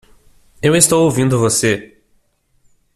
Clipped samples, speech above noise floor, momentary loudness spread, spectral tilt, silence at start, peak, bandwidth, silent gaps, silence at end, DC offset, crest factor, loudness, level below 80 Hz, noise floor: under 0.1%; 46 dB; 8 LU; -4 dB/octave; 0.65 s; 0 dBFS; 16 kHz; none; 1.1 s; under 0.1%; 16 dB; -14 LUFS; -48 dBFS; -59 dBFS